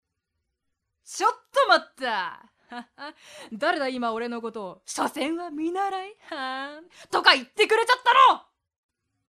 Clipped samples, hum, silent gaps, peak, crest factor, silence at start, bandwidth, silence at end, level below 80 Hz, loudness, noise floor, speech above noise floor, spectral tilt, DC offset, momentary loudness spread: under 0.1%; none; none; 0 dBFS; 24 dB; 1.1 s; 14 kHz; 0.9 s; -74 dBFS; -23 LUFS; -80 dBFS; 56 dB; -1.5 dB/octave; under 0.1%; 20 LU